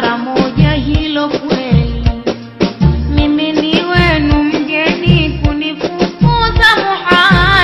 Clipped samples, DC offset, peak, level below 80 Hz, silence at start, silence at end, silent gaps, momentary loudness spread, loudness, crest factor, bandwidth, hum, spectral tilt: under 0.1%; under 0.1%; 0 dBFS; -20 dBFS; 0 s; 0 s; none; 8 LU; -12 LUFS; 12 dB; 12.5 kHz; none; -6.5 dB/octave